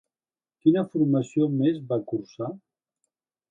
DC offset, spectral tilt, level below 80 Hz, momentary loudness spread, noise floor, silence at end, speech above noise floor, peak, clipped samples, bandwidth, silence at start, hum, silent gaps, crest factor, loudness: under 0.1%; -9 dB/octave; -72 dBFS; 12 LU; under -90 dBFS; 0.95 s; over 66 dB; -8 dBFS; under 0.1%; 7.6 kHz; 0.65 s; none; none; 18 dB; -25 LUFS